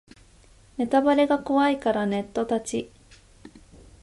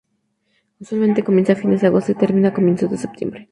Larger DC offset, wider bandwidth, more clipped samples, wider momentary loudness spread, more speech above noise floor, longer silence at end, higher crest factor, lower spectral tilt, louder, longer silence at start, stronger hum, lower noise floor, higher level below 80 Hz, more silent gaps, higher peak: neither; about the same, 11.5 kHz vs 10.5 kHz; neither; about the same, 12 LU vs 10 LU; second, 31 dB vs 52 dB; first, 0.55 s vs 0.1 s; about the same, 18 dB vs 16 dB; second, -5 dB/octave vs -8.5 dB/octave; second, -24 LUFS vs -17 LUFS; about the same, 0.8 s vs 0.8 s; neither; second, -54 dBFS vs -68 dBFS; about the same, -56 dBFS vs -60 dBFS; neither; second, -8 dBFS vs -2 dBFS